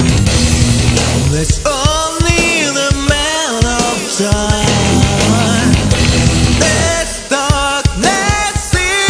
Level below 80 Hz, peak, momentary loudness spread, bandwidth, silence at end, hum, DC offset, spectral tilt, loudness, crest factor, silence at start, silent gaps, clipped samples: -20 dBFS; 0 dBFS; 3 LU; 11 kHz; 0 s; none; under 0.1%; -4 dB/octave; -12 LUFS; 12 dB; 0 s; none; under 0.1%